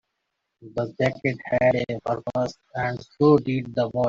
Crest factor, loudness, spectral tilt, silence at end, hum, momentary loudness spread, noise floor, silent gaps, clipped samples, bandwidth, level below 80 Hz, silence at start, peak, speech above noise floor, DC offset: 18 dB; -24 LUFS; -7.5 dB/octave; 0 s; none; 11 LU; -79 dBFS; none; under 0.1%; 7.6 kHz; -56 dBFS; 0.6 s; -6 dBFS; 56 dB; under 0.1%